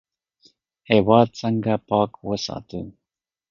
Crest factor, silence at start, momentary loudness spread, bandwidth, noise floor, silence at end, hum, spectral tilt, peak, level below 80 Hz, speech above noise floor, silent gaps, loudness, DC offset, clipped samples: 22 dB; 0.9 s; 18 LU; 7.4 kHz; -87 dBFS; 0.6 s; none; -6.5 dB/octave; 0 dBFS; -54 dBFS; 67 dB; none; -21 LUFS; under 0.1%; under 0.1%